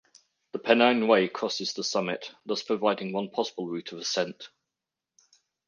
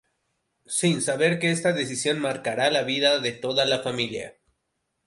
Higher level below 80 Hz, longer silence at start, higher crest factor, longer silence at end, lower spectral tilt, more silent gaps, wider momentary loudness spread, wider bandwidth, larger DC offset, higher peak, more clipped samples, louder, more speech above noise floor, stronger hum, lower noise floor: second, -80 dBFS vs -66 dBFS; second, 0.55 s vs 0.7 s; about the same, 22 dB vs 18 dB; first, 1.2 s vs 0.75 s; about the same, -3.5 dB/octave vs -3.5 dB/octave; neither; first, 14 LU vs 7 LU; second, 9.8 kHz vs 11.5 kHz; neither; about the same, -6 dBFS vs -8 dBFS; neither; second, -27 LUFS vs -24 LUFS; first, 61 dB vs 53 dB; neither; first, -88 dBFS vs -77 dBFS